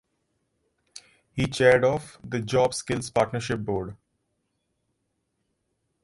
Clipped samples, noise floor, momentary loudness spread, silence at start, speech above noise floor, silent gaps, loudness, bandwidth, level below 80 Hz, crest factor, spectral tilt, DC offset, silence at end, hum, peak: under 0.1%; -77 dBFS; 13 LU; 0.95 s; 52 dB; none; -25 LUFS; 11.5 kHz; -54 dBFS; 24 dB; -5 dB/octave; under 0.1%; 2.1 s; none; -4 dBFS